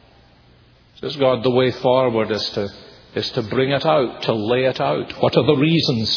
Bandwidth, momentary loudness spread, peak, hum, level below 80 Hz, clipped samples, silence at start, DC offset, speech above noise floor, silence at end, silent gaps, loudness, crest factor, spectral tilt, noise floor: 5.4 kHz; 10 LU; 0 dBFS; none; -54 dBFS; under 0.1%; 1.05 s; under 0.1%; 33 dB; 0 s; none; -19 LUFS; 18 dB; -6.5 dB/octave; -51 dBFS